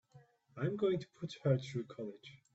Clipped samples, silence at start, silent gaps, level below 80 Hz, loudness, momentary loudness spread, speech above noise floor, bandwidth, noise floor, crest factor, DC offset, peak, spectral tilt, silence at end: under 0.1%; 0.15 s; none; -76 dBFS; -38 LUFS; 14 LU; 27 dB; 8 kHz; -65 dBFS; 20 dB; under 0.1%; -18 dBFS; -7 dB/octave; 0.2 s